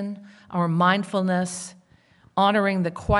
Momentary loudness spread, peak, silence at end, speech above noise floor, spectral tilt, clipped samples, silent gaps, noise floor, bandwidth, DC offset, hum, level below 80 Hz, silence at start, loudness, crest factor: 14 LU; -6 dBFS; 0 s; 34 dB; -5.5 dB/octave; under 0.1%; none; -57 dBFS; 11.5 kHz; under 0.1%; none; -44 dBFS; 0 s; -23 LUFS; 18 dB